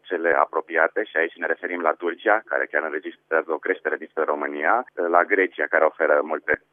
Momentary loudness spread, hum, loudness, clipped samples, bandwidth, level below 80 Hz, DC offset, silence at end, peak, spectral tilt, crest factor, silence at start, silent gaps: 6 LU; none; -23 LUFS; under 0.1%; 3.7 kHz; -68 dBFS; under 0.1%; 0.15 s; -2 dBFS; -7 dB/octave; 20 dB; 0.05 s; none